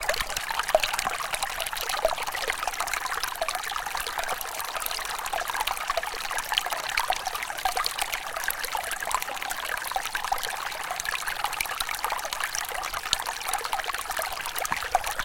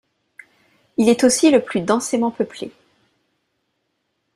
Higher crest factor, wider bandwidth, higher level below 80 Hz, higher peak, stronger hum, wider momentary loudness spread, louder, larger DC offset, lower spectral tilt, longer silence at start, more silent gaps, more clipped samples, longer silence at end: first, 28 dB vs 18 dB; first, 17 kHz vs 15 kHz; first, -48 dBFS vs -62 dBFS; about the same, -2 dBFS vs -2 dBFS; neither; second, 4 LU vs 14 LU; second, -28 LUFS vs -18 LUFS; neither; second, 0.5 dB/octave vs -4 dB/octave; second, 0 s vs 1 s; neither; neither; second, 0 s vs 1.65 s